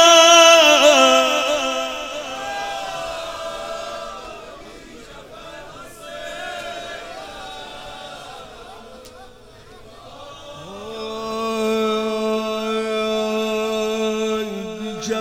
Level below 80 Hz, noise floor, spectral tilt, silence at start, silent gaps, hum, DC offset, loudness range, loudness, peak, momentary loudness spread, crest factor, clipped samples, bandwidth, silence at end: -52 dBFS; -43 dBFS; -1.5 dB/octave; 0 s; none; none; under 0.1%; 19 LU; -17 LUFS; 0 dBFS; 27 LU; 20 dB; under 0.1%; 16.5 kHz; 0 s